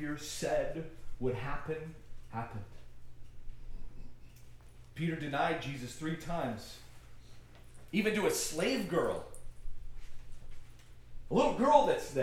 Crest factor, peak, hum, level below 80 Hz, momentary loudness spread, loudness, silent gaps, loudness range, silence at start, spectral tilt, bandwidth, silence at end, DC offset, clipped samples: 24 dB; -12 dBFS; none; -50 dBFS; 24 LU; -34 LUFS; none; 10 LU; 0 s; -4.5 dB/octave; 16 kHz; 0 s; under 0.1%; under 0.1%